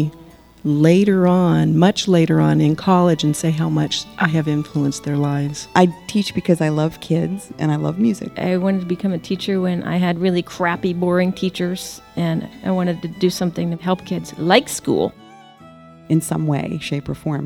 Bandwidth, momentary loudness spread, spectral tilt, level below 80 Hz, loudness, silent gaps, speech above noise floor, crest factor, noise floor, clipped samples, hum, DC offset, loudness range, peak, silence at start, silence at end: 15.5 kHz; 9 LU; -6 dB/octave; -52 dBFS; -19 LUFS; none; 26 dB; 18 dB; -44 dBFS; under 0.1%; none; 0.1%; 5 LU; 0 dBFS; 0 s; 0 s